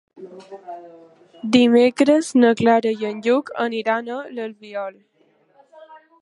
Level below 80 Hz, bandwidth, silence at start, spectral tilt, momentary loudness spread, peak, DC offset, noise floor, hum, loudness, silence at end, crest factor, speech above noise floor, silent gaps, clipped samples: -66 dBFS; 11.5 kHz; 0.2 s; -5 dB/octave; 22 LU; -2 dBFS; under 0.1%; -59 dBFS; none; -18 LUFS; 0.25 s; 18 dB; 40 dB; none; under 0.1%